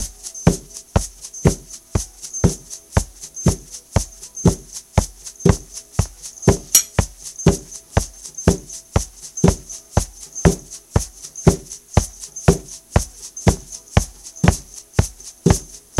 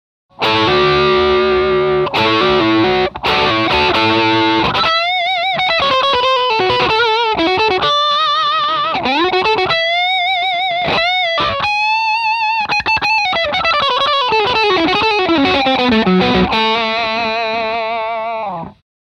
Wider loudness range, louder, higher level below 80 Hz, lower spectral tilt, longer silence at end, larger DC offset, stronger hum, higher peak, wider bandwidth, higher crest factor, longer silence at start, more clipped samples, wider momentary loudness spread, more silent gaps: about the same, 3 LU vs 1 LU; second, -21 LUFS vs -13 LUFS; first, -28 dBFS vs -40 dBFS; about the same, -5 dB/octave vs -5 dB/octave; second, 0 s vs 0.4 s; neither; second, none vs 50 Hz at -55 dBFS; about the same, 0 dBFS vs 0 dBFS; first, 16.5 kHz vs 9 kHz; first, 20 dB vs 14 dB; second, 0 s vs 0.4 s; neither; first, 11 LU vs 4 LU; neither